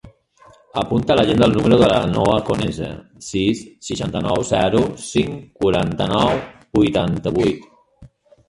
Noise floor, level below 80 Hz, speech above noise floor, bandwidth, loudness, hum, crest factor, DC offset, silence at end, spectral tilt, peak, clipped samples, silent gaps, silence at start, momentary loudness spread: -50 dBFS; -40 dBFS; 32 dB; 11.5 kHz; -18 LUFS; none; 18 dB; under 0.1%; 0.4 s; -6 dB/octave; -2 dBFS; under 0.1%; none; 0.05 s; 12 LU